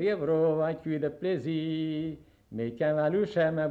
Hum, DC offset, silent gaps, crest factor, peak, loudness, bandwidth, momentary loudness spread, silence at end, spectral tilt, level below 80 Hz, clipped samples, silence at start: none; under 0.1%; none; 12 dB; -16 dBFS; -29 LUFS; 7.6 kHz; 10 LU; 0 s; -8.5 dB/octave; -64 dBFS; under 0.1%; 0 s